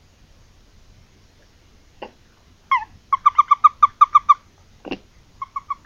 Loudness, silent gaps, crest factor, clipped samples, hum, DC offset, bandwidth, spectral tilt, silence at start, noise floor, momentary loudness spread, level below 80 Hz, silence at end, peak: -16 LUFS; none; 22 dB; under 0.1%; none; under 0.1%; 7 kHz; -3 dB/octave; 2.7 s; -53 dBFS; 20 LU; -54 dBFS; 0.15 s; 0 dBFS